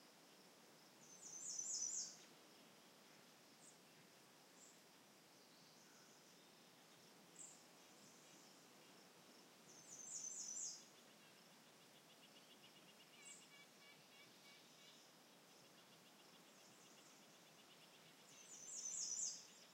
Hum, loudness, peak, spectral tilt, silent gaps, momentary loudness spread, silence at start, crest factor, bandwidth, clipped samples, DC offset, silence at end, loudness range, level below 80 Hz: none; -53 LUFS; -34 dBFS; 0 dB/octave; none; 19 LU; 0 s; 24 dB; 16 kHz; under 0.1%; under 0.1%; 0 s; 15 LU; under -90 dBFS